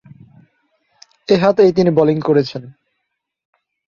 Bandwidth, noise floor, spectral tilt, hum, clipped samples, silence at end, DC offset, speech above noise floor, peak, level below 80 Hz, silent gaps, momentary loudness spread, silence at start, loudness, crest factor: 7.2 kHz; -75 dBFS; -7.5 dB/octave; none; under 0.1%; 1.25 s; under 0.1%; 61 dB; -2 dBFS; -56 dBFS; none; 16 LU; 1.3 s; -14 LUFS; 16 dB